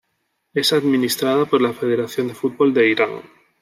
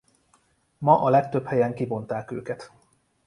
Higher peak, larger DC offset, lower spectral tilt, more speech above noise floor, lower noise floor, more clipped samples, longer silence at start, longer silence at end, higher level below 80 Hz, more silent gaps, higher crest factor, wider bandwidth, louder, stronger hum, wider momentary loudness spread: about the same, -4 dBFS vs -4 dBFS; neither; second, -4.5 dB/octave vs -8.5 dB/octave; first, 53 dB vs 42 dB; first, -71 dBFS vs -65 dBFS; neither; second, 0.55 s vs 0.8 s; second, 0.4 s vs 0.6 s; about the same, -68 dBFS vs -64 dBFS; neither; second, 16 dB vs 22 dB; first, 16 kHz vs 11 kHz; first, -18 LUFS vs -24 LUFS; neither; second, 8 LU vs 15 LU